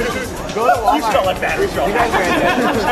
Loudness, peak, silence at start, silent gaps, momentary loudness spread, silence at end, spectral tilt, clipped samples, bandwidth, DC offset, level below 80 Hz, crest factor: -16 LUFS; 0 dBFS; 0 s; none; 5 LU; 0 s; -4.5 dB/octave; under 0.1%; 14 kHz; under 0.1%; -34 dBFS; 16 dB